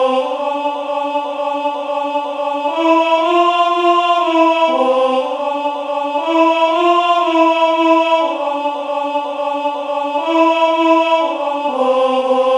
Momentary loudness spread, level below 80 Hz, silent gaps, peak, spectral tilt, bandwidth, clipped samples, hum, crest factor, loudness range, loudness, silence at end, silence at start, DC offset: 7 LU; -72 dBFS; none; -2 dBFS; -2.5 dB/octave; 10.5 kHz; under 0.1%; none; 14 dB; 2 LU; -15 LUFS; 0 s; 0 s; under 0.1%